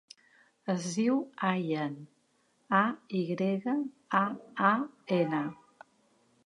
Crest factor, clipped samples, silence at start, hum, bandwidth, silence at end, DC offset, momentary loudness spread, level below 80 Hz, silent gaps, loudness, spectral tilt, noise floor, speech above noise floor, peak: 22 dB; under 0.1%; 0.65 s; none; 11 kHz; 0.9 s; under 0.1%; 7 LU; -82 dBFS; none; -31 LUFS; -6 dB/octave; -71 dBFS; 41 dB; -10 dBFS